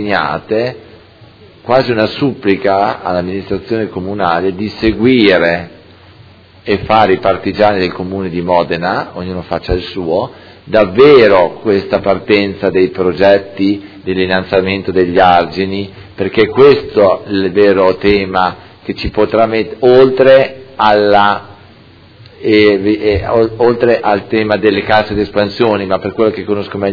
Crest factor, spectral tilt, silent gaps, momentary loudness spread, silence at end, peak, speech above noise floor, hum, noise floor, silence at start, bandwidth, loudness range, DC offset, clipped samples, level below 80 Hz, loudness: 12 dB; -8 dB/octave; none; 11 LU; 0 s; 0 dBFS; 29 dB; none; -40 dBFS; 0 s; 5.4 kHz; 4 LU; under 0.1%; 0.6%; -38 dBFS; -12 LUFS